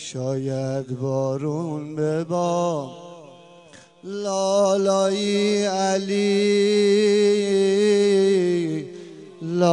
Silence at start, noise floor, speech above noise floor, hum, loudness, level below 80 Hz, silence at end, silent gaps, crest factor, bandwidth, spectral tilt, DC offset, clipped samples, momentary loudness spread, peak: 0 s; -48 dBFS; 28 dB; none; -21 LUFS; -72 dBFS; 0 s; none; 16 dB; 10.5 kHz; -5.5 dB/octave; under 0.1%; under 0.1%; 13 LU; -6 dBFS